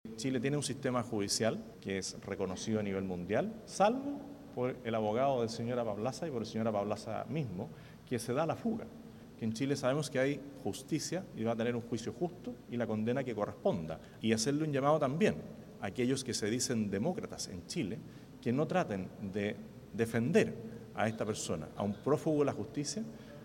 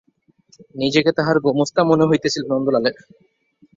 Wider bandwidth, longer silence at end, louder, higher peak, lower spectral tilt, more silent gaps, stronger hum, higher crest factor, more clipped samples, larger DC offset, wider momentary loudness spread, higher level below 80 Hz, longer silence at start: first, 16.5 kHz vs 7.8 kHz; second, 0 s vs 0.85 s; second, -35 LUFS vs -18 LUFS; second, -16 dBFS vs -2 dBFS; about the same, -5 dB/octave vs -5.5 dB/octave; neither; neither; about the same, 20 dB vs 16 dB; neither; neither; first, 11 LU vs 7 LU; second, -66 dBFS vs -58 dBFS; second, 0.05 s vs 0.75 s